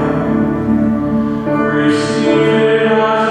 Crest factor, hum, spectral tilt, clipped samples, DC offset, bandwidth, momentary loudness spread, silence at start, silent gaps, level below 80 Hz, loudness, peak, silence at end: 12 dB; none; -6.5 dB/octave; under 0.1%; under 0.1%; 10 kHz; 4 LU; 0 s; none; -38 dBFS; -13 LUFS; 0 dBFS; 0 s